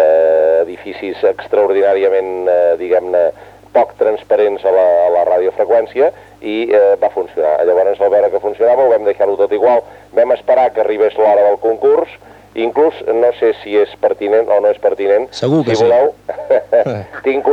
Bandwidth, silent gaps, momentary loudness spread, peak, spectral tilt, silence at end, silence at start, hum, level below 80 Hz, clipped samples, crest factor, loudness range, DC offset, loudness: 8 kHz; none; 6 LU; 0 dBFS; -6.5 dB/octave; 0 s; 0 s; none; -54 dBFS; under 0.1%; 12 dB; 1 LU; under 0.1%; -13 LUFS